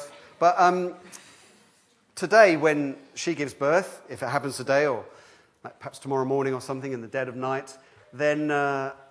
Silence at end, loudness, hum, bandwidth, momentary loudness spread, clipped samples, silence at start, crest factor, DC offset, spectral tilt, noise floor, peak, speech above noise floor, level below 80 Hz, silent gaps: 0.15 s; -25 LUFS; none; 11 kHz; 22 LU; under 0.1%; 0 s; 24 dB; under 0.1%; -5 dB/octave; -62 dBFS; -2 dBFS; 38 dB; -76 dBFS; none